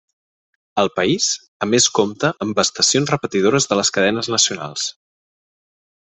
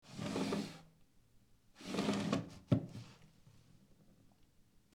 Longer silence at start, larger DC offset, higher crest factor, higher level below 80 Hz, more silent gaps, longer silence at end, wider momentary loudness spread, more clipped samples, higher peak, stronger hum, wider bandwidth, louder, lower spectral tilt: first, 0.75 s vs 0.05 s; neither; about the same, 20 dB vs 24 dB; first, -58 dBFS vs -68 dBFS; first, 1.48-1.60 s vs none; about the same, 1.1 s vs 1.2 s; second, 9 LU vs 17 LU; neither; first, 0 dBFS vs -18 dBFS; neither; second, 8.6 kHz vs 16 kHz; first, -17 LUFS vs -40 LUFS; second, -2.5 dB/octave vs -6 dB/octave